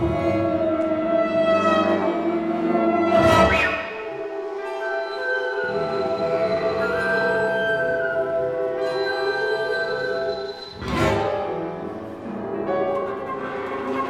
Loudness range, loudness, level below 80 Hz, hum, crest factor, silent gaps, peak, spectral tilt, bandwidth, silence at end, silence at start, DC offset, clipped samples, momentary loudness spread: 6 LU; -22 LUFS; -44 dBFS; none; 18 dB; none; -4 dBFS; -6 dB/octave; 13.5 kHz; 0 s; 0 s; under 0.1%; under 0.1%; 11 LU